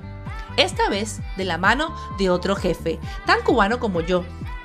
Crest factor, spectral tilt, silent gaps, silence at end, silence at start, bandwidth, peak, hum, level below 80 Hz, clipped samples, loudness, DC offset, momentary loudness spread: 20 dB; -4.5 dB/octave; none; 0 s; 0 s; 15 kHz; -2 dBFS; none; -36 dBFS; under 0.1%; -22 LUFS; under 0.1%; 9 LU